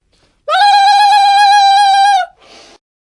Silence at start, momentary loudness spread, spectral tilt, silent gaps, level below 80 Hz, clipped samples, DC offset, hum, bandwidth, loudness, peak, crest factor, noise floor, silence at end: 0.5 s; 9 LU; 3.5 dB/octave; none; -62 dBFS; under 0.1%; under 0.1%; none; 11.5 kHz; -8 LUFS; 0 dBFS; 10 dB; -41 dBFS; 0.75 s